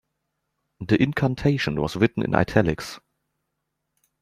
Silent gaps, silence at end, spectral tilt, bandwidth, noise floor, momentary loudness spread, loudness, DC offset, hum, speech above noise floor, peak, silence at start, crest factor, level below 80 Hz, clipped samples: none; 1.25 s; -7 dB/octave; 14.5 kHz; -79 dBFS; 14 LU; -23 LUFS; under 0.1%; none; 57 dB; -2 dBFS; 0.8 s; 22 dB; -48 dBFS; under 0.1%